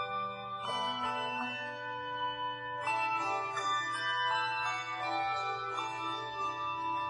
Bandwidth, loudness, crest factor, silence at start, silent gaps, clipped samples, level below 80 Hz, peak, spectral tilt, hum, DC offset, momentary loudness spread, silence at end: 10.5 kHz; -35 LUFS; 14 dB; 0 s; none; under 0.1%; -74 dBFS; -22 dBFS; -2.5 dB/octave; none; under 0.1%; 6 LU; 0 s